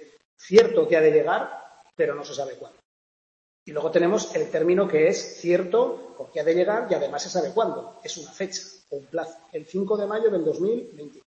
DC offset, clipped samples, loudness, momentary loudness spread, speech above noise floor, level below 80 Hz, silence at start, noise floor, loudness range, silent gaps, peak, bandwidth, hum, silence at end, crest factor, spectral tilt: under 0.1%; under 0.1%; -23 LUFS; 16 LU; over 67 dB; -72 dBFS; 0 s; under -90 dBFS; 5 LU; 0.25-0.37 s, 2.85-3.66 s; -2 dBFS; 8 kHz; none; 0.15 s; 22 dB; -5 dB/octave